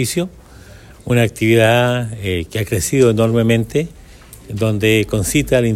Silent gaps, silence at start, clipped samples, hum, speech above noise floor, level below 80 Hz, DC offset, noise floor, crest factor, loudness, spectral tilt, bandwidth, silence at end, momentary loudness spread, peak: none; 0 s; under 0.1%; none; 24 dB; -38 dBFS; under 0.1%; -39 dBFS; 16 dB; -16 LUFS; -5.5 dB/octave; 16 kHz; 0 s; 9 LU; 0 dBFS